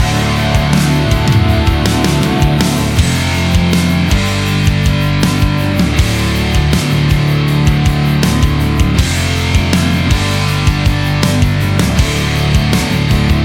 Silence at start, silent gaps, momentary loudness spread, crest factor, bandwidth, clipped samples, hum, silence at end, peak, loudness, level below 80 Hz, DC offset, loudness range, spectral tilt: 0 s; none; 2 LU; 12 dB; 17 kHz; under 0.1%; none; 0 s; 0 dBFS; -12 LUFS; -18 dBFS; under 0.1%; 1 LU; -5.5 dB/octave